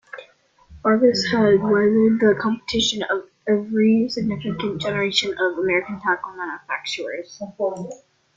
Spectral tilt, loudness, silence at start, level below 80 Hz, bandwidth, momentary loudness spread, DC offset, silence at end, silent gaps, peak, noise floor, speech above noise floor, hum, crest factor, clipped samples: -4.5 dB/octave; -20 LUFS; 0.15 s; -56 dBFS; 7.8 kHz; 14 LU; under 0.1%; 0.4 s; none; -4 dBFS; -53 dBFS; 32 dB; none; 16 dB; under 0.1%